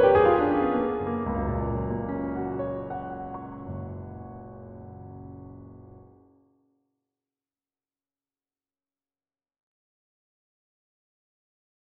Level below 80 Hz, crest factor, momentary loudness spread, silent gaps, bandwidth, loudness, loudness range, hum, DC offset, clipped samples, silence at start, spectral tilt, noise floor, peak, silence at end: -46 dBFS; 22 dB; 21 LU; none; 4.6 kHz; -27 LUFS; 21 LU; none; under 0.1%; under 0.1%; 0 s; -7 dB/octave; under -90 dBFS; -8 dBFS; 5.9 s